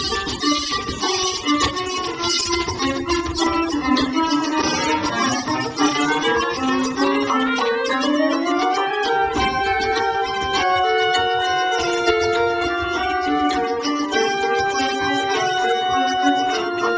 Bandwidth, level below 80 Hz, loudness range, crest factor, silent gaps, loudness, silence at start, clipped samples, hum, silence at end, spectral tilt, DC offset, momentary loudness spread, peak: 8 kHz; -42 dBFS; 1 LU; 14 dB; none; -19 LUFS; 0 s; under 0.1%; none; 0 s; -3 dB/octave; under 0.1%; 3 LU; -4 dBFS